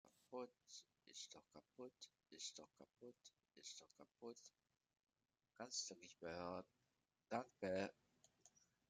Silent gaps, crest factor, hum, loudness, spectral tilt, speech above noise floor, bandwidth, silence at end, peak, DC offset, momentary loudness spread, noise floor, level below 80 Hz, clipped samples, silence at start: none; 26 dB; none; -54 LUFS; -3 dB/octave; 32 dB; 13 kHz; 0.4 s; -30 dBFS; under 0.1%; 17 LU; -87 dBFS; under -90 dBFS; under 0.1%; 0.05 s